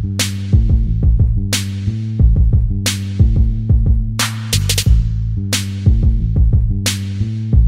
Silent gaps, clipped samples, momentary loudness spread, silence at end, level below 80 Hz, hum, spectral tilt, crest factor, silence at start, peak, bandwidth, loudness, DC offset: none; under 0.1%; 5 LU; 0 s; -16 dBFS; none; -4.5 dB/octave; 14 dB; 0 s; 0 dBFS; 16.5 kHz; -16 LUFS; under 0.1%